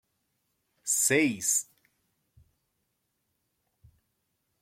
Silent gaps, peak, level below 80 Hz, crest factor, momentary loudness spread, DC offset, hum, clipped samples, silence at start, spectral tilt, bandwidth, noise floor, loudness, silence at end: none; -10 dBFS; -74 dBFS; 24 dB; 15 LU; under 0.1%; none; under 0.1%; 0.85 s; -2.5 dB/octave; 16.5 kHz; -79 dBFS; -25 LUFS; 3 s